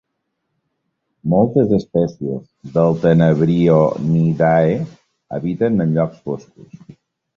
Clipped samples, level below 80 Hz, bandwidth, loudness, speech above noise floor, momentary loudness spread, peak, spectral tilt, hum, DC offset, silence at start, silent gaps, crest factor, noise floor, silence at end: under 0.1%; -48 dBFS; 6.8 kHz; -16 LUFS; 58 dB; 14 LU; -2 dBFS; -9.5 dB/octave; none; under 0.1%; 1.25 s; none; 16 dB; -74 dBFS; 0.6 s